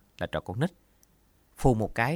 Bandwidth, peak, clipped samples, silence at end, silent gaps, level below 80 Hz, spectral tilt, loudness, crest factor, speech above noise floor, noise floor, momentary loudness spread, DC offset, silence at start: 17.5 kHz; -8 dBFS; under 0.1%; 0 s; none; -42 dBFS; -7 dB/octave; -29 LUFS; 22 dB; 37 dB; -64 dBFS; 8 LU; under 0.1%; 0.2 s